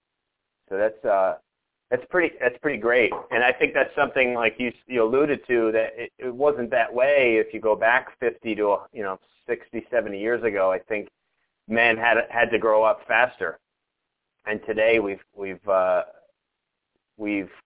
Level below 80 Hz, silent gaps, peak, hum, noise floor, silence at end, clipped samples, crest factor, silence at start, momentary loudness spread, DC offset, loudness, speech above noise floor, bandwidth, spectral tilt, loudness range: -62 dBFS; none; -4 dBFS; none; -81 dBFS; 0.15 s; under 0.1%; 20 dB; 0.7 s; 12 LU; under 0.1%; -23 LUFS; 58 dB; 4 kHz; -8 dB/octave; 4 LU